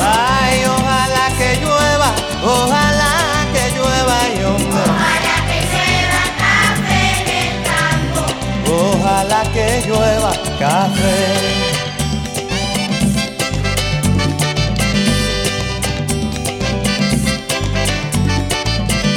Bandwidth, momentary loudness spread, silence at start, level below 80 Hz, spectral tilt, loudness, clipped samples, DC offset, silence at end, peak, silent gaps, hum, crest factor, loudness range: over 20 kHz; 6 LU; 0 s; -28 dBFS; -4 dB/octave; -15 LUFS; under 0.1%; under 0.1%; 0 s; -2 dBFS; none; none; 14 dB; 3 LU